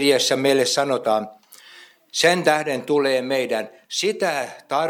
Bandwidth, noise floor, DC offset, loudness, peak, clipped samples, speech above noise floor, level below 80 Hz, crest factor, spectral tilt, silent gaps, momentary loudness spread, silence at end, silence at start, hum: 18.5 kHz; -48 dBFS; under 0.1%; -20 LUFS; -4 dBFS; under 0.1%; 27 dB; -76 dBFS; 18 dB; -3 dB/octave; none; 10 LU; 0 s; 0 s; none